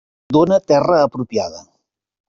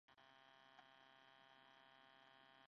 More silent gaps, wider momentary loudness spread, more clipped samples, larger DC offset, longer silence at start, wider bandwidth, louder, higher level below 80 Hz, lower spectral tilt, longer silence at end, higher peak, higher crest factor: neither; first, 9 LU vs 1 LU; neither; neither; first, 0.3 s vs 0.1 s; first, 7.4 kHz vs 6.2 kHz; first, -16 LUFS vs -68 LUFS; first, -54 dBFS vs under -90 dBFS; first, -6.5 dB/octave vs 0 dB/octave; first, 0.7 s vs 0 s; first, -2 dBFS vs -52 dBFS; about the same, 14 dB vs 18 dB